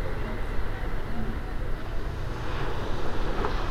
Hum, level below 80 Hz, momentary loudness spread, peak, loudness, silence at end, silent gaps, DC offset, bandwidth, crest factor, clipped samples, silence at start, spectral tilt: none; -32 dBFS; 5 LU; -14 dBFS; -34 LUFS; 0 s; none; under 0.1%; 7.4 kHz; 12 dB; under 0.1%; 0 s; -6.5 dB/octave